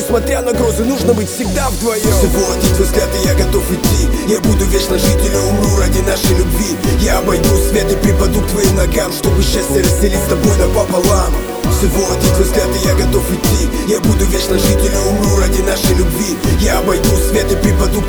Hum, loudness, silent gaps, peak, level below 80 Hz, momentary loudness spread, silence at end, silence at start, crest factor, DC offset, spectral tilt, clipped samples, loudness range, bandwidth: none; -13 LUFS; none; 0 dBFS; -18 dBFS; 3 LU; 0 s; 0 s; 12 dB; under 0.1%; -5 dB/octave; under 0.1%; 1 LU; over 20 kHz